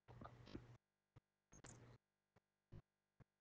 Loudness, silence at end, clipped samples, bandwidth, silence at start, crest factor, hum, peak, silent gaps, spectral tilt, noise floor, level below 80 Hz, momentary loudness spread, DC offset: -64 LUFS; 0.15 s; under 0.1%; 7.4 kHz; 0.1 s; 24 dB; none; -40 dBFS; none; -6 dB/octave; -84 dBFS; -76 dBFS; 7 LU; under 0.1%